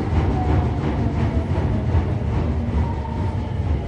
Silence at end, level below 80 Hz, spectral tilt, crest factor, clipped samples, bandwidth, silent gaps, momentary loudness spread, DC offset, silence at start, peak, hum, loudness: 0 s; -24 dBFS; -9 dB/octave; 12 dB; under 0.1%; 7.4 kHz; none; 4 LU; under 0.1%; 0 s; -8 dBFS; none; -22 LUFS